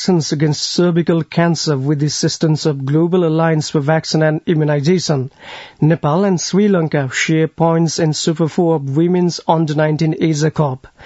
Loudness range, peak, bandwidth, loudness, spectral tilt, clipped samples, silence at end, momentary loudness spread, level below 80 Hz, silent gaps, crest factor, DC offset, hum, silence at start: 1 LU; 0 dBFS; 8 kHz; -15 LUFS; -6 dB/octave; under 0.1%; 0 s; 3 LU; -54 dBFS; none; 14 dB; under 0.1%; none; 0 s